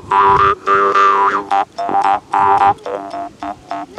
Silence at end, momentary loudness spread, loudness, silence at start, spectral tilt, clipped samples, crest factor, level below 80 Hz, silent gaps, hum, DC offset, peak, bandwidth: 0 s; 15 LU; -13 LUFS; 0.05 s; -5 dB/octave; under 0.1%; 12 dB; -46 dBFS; none; none; under 0.1%; -2 dBFS; 11 kHz